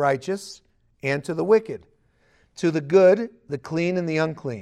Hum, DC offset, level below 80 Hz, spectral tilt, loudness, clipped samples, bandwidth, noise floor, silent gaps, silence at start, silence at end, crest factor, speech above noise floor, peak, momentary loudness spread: none; under 0.1%; -64 dBFS; -6.5 dB/octave; -22 LUFS; under 0.1%; 12.5 kHz; -62 dBFS; none; 0 s; 0 s; 18 dB; 40 dB; -6 dBFS; 16 LU